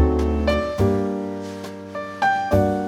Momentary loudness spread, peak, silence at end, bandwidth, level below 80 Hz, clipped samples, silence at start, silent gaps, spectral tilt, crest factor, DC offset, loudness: 13 LU; -6 dBFS; 0 s; 15 kHz; -30 dBFS; under 0.1%; 0 s; none; -7 dB/octave; 14 dB; under 0.1%; -22 LUFS